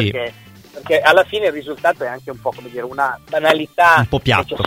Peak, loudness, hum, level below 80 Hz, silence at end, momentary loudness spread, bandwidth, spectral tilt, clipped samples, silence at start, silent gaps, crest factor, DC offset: 0 dBFS; -16 LUFS; none; -42 dBFS; 0 s; 14 LU; 16 kHz; -5 dB/octave; under 0.1%; 0 s; none; 16 dB; under 0.1%